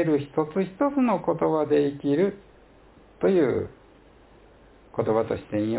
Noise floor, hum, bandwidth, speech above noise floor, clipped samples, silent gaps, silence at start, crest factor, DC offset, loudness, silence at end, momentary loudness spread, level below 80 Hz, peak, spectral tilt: -53 dBFS; none; 4 kHz; 30 dB; under 0.1%; none; 0 s; 16 dB; under 0.1%; -25 LUFS; 0 s; 6 LU; -56 dBFS; -10 dBFS; -11.5 dB/octave